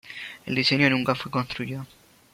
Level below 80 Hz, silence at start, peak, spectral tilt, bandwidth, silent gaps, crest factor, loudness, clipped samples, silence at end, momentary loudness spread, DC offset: -60 dBFS; 0.05 s; -6 dBFS; -5.5 dB/octave; 16 kHz; none; 20 dB; -24 LUFS; under 0.1%; 0.5 s; 18 LU; under 0.1%